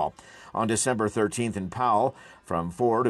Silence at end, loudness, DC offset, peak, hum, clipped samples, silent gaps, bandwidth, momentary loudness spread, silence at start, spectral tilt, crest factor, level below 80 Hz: 0 s; -27 LUFS; under 0.1%; -12 dBFS; none; under 0.1%; none; 12.5 kHz; 8 LU; 0 s; -5 dB/octave; 14 dB; -60 dBFS